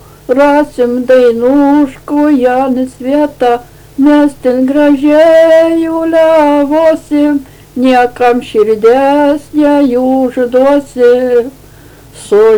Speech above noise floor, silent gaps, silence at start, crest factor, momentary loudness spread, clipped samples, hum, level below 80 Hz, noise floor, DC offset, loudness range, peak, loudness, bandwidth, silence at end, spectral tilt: 28 dB; none; 0.3 s; 8 dB; 6 LU; 0.2%; none; -42 dBFS; -35 dBFS; under 0.1%; 2 LU; 0 dBFS; -9 LUFS; 19.5 kHz; 0 s; -5.5 dB/octave